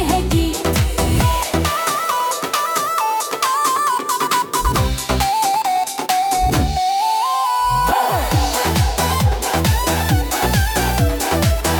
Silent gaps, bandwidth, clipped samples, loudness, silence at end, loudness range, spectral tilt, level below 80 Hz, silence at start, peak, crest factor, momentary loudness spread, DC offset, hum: none; 19 kHz; under 0.1%; -17 LUFS; 0 s; 1 LU; -4 dB/octave; -26 dBFS; 0 s; -2 dBFS; 14 dB; 2 LU; under 0.1%; none